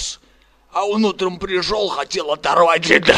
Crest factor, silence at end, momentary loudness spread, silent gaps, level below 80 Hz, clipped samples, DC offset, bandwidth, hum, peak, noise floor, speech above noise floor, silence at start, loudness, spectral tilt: 18 dB; 0 s; 11 LU; none; -46 dBFS; under 0.1%; under 0.1%; 13 kHz; none; 0 dBFS; -53 dBFS; 37 dB; 0 s; -18 LUFS; -3.5 dB/octave